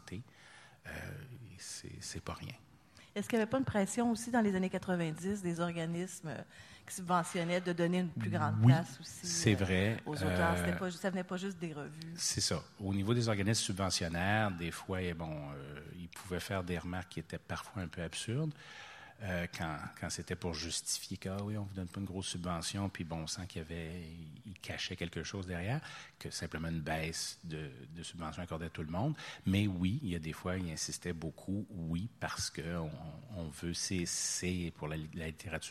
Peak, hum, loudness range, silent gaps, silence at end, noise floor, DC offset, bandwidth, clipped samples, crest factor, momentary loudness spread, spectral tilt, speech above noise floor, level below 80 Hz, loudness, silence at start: -14 dBFS; none; 8 LU; none; 0 s; -59 dBFS; under 0.1%; 15.5 kHz; under 0.1%; 24 dB; 15 LU; -4.5 dB/octave; 22 dB; -60 dBFS; -37 LUFS; 0.05 s